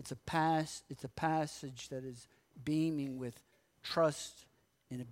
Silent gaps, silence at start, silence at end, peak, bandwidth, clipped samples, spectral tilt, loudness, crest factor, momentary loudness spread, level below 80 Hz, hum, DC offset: none; 0 s; 0 s; -20 dBFS; 16 kHz; under 0.1%; -5.5 dB/octave; -37 LUFS; 18 dB; 15 LU; -68 dBFS; none; under 0.1%